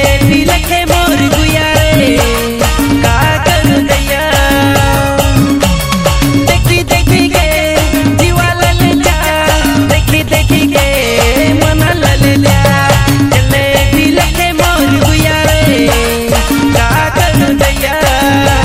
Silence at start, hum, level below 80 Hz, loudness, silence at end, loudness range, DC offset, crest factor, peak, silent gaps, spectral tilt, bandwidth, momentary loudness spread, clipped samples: 0 s; none; -18 dBFS; -9 LUFS; 0 s; 1 LU; under 0.1%; 8 dB; 0 dBFS; none; -4.5 dB/octave; 16.5 kHz; 2 LU; 0.6%